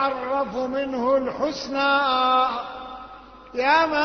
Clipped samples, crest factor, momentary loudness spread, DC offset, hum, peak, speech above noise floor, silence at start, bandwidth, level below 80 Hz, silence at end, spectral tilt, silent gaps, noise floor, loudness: under 0.1%; 18 dB; 16 LU; under 0.1%; none; -6 dBFS; 21 dB; 0 s; 6.6 kHz; -54 dBFS; 0 s; -4 dB/octave; none; -43 dBFS; -22 LUFS